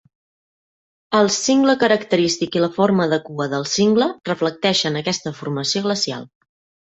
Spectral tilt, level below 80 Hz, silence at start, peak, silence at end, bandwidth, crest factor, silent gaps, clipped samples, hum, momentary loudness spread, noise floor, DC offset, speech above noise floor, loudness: -4 dB/octave; -60 dBFS; 1.1 s; -2 dBFS; 0.55 s; 8.2 kHz; 18 dB; none; under 0.1%; none; 8 LU; under -90 dBFS; under 0.1%; over 72 dB; -19 LUFS